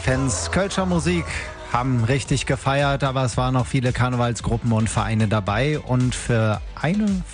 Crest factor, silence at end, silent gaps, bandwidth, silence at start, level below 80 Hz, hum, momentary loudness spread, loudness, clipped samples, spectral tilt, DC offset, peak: 18 dB; 0 s; none; 10 kHz; 0 s; -36 dBFS; none; 3 LU; -22 LUFS; under 0.1%; -5.5 dB/octave; under 0.1%; -4 dBFS